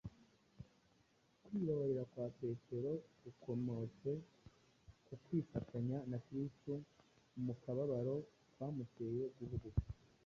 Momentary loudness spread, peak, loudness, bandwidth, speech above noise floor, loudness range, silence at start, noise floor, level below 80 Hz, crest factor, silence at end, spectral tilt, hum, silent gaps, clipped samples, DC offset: 18 LU; -24 dBFS; -45 LUFS; 7.2 kHz; 32 dB; 2 LU; 0.05 s; -75 dBFS; -60 dBFS; 20 dB; 0.3 s; -10.5 dB/octave; none; none; under 0.1%; under 0.1%